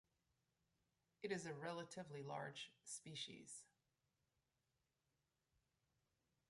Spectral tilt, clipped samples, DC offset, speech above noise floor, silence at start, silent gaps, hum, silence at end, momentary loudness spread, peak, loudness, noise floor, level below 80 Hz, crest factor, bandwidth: -3.5 dB/octave; under 0.1%; under 0.1%; 37 dB; 1.2 s; none; none; 2.85 s; 8 LU; -32 dBFS; -52 LUFS; -90 dBFS; under -90 dBFS; 24 dB; 11.5 kHz